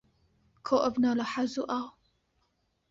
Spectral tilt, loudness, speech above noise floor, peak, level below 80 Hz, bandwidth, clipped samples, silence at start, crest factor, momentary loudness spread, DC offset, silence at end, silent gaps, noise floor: -5 dB/octave; -30 LUFS; 47 dB; -12 dBFS; -68 dBFS; 7.6 kHz; under 0.1%; 0.65 s; 20 dB; 13 LU; under 0.1%; 1 s; none; -75 dBFS